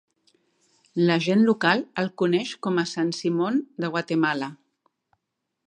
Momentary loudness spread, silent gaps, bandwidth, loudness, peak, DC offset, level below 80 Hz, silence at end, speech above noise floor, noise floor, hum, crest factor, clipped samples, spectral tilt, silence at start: 9 LU; none; 10 kHz; -24 LUFS; -4 dBFS; under 0.1%; -76 dBFS; 1.15 s; 57 dB; -81 dBFS; none; 22 dB; under 0.1%; -6 dB/octave; 0.95 s